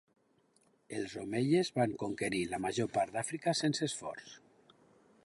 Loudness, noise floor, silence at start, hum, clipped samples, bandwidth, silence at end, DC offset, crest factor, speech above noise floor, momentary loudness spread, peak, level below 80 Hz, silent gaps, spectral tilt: -35 LUFS; -72 dBFS; 0.9 s; none; under 0.1%; 11.5 kHz; 0.85 s; under 0.1%; 18 dB; 37 dB; 12 LU; -18 dBFS; -70 dBFS; none; -4.5 dB/octave